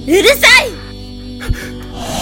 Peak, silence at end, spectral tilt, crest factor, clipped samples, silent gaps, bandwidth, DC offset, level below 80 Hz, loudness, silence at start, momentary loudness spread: 0 dBFS; 0 s; -2.5 dB/octave; 14 dB; 0.7%; none; over 20 kHz; under 0.1%; -28 dBFS; -7 LUFS; 0 s; 23 LU